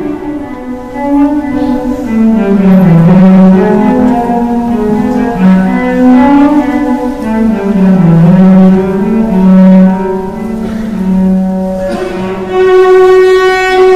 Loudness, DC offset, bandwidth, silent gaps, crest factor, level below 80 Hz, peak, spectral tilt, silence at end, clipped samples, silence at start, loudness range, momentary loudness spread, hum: -7 LUFS; under 0.1%; 7.8 kHz; none; 6 dB; -30 dBFS; 0 dBFS; -8.5 dB/octave; 0 s; 0.5%; 0 s; 3 LU; 12 LU; none